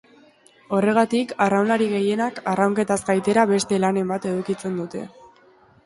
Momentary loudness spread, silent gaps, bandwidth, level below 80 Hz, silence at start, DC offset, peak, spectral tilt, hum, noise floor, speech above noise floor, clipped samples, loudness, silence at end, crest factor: 9 LU; none; 11.5 kHz; -62 dBFS; 0.7 s; under 0.1%; -4 dBFS; -5.5 dB/octave; none; -54 dBFS; 33 dB; under 0.1%; -21 LUFS; 0.8 s; 18 dB